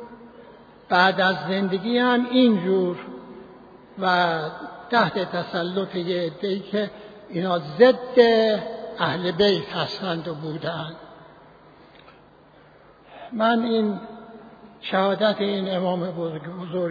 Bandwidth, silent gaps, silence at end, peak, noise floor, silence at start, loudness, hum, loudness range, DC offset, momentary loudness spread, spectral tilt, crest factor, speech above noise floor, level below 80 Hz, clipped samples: 5 kHz; none; 0 s; -2 dBFS; -52 dBFS; 0 s; -22 LUFS; none; 7 LU; under 0.1%; 18 LU; -7 dB/octave; 20 dB; 30 dB; -64 dBFS; under 0.1%